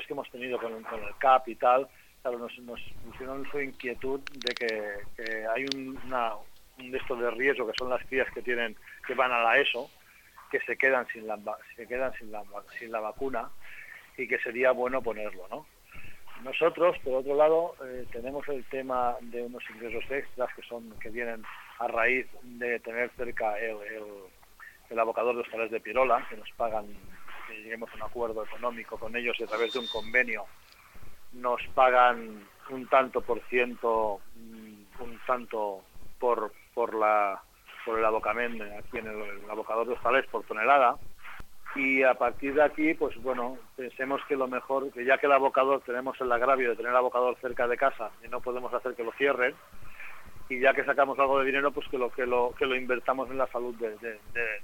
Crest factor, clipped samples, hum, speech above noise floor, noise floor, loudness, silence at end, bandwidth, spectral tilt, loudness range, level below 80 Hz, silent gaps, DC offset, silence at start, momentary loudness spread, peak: 22 dB; under 0.1%; none; 26 dB; -55 dBFS; -29 LUFS; 0 s; 17 kHz; -4.5 dB/octave; 7 LU; -58 dBFS; none; under 0.1%; 0 s; 18 LU; -8 dBFS